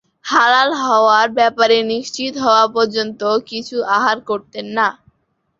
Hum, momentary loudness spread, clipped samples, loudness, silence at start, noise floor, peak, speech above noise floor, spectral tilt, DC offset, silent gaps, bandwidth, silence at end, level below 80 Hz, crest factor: none; 10 LU; under 0.1%; -15 LUFS; 0.25 s; -65 dBFS; -2 dBFS; 50 dB; -2.5 dB/octave; under 0.1%; none; 7.8 kHz; 0.65 s; -62 dBFS; 14 dB